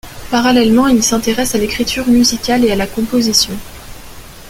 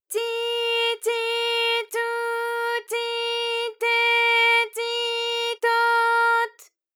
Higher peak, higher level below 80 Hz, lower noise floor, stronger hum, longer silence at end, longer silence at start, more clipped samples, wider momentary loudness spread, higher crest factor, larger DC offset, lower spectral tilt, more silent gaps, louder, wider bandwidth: first, 0 dBFS vs -10 dBFS; first, -34 dBFS vs under -90 dBFS; second, -33 dBFS vs -45 dBFS; neither; second, 0 s vs 0.3 s; about the same, 0.05 s vs 0.1 s; neither; about the same, 8 LU vs 8 LU; about the same, 14 dB vs 14 dB; neither; first, -3 dB/octave vs 4 dB/octave; neither; first, -13 LUFS vs -22 LUFS; second, 16.5 kHz vs 19 kHz